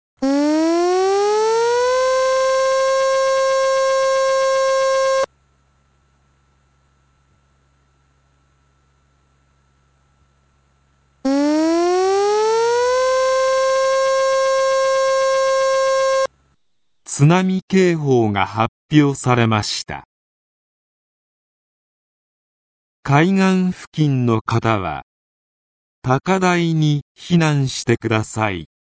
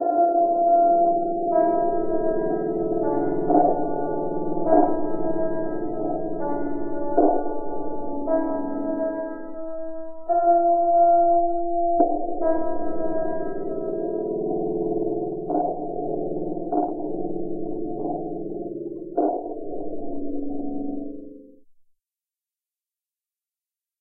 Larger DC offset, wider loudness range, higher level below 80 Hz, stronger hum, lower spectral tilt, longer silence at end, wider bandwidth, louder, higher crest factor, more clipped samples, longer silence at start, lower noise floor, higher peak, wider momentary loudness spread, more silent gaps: neither; about the same, 7 LU vs 9 LU; about the same, -52 dBFS vs -48 dBFS; neither; second, -5.5 dB/octave vs -14 dB/octave; second, 0.25 s vs 2.55 s; first, 8 kHz vs 2.1 kHz; first, -17 LUFS vs -24 LUFS; about the same, 18 dB vs 18 dB; neither; first, 0.2 s vs 0 s; second, -74 dBFS vs under -90 dBFS; first, 0 dBFS vs -4 dBFS; second, 5 LU vs 13 LU; first, 17.62-17.68 s, 18.68-18.89 s, 20.05-23.03 s, 23.87-23.92 s, 24.41-24.45 s, 25.03-26.02 s, 27.02-27.15 s vs none